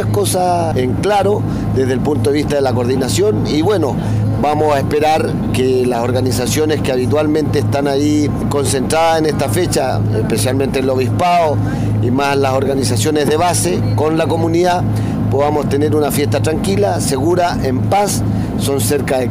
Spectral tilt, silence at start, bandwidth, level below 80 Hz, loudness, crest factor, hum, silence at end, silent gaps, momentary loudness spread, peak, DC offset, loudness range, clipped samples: -5.5 dB/octave; 0 s; 16 kHz; -34 dBFS; -15 LUFS; 10 dB; none; 0 s; none; 3 LU; -4 dBFS; 0.1%; 1 LU; under 0.1%